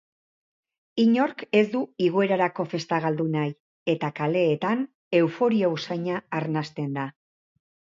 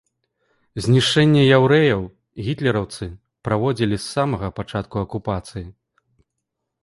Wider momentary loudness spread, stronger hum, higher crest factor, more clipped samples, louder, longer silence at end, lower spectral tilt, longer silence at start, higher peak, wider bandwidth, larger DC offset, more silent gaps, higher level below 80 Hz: second, 8 LU vs 20 LU; neither; about the same, 18 dB vs 20 dB; neither; second, -25 LUFS vs -19 LUFS; second, 0.85 s vs 1.15 s; about the same, -7 dB/octave vs -6 dB/octave; first, 0.95 s vs 0.75 s; second, -6 dBFS vs -2 dBFS; second, 7.6 kHz vs 11.5 kHz; neither; first, 3.60-3.86 s, 4.94-5.11 s vs none; second, -72 dBFS vs -46 dBFS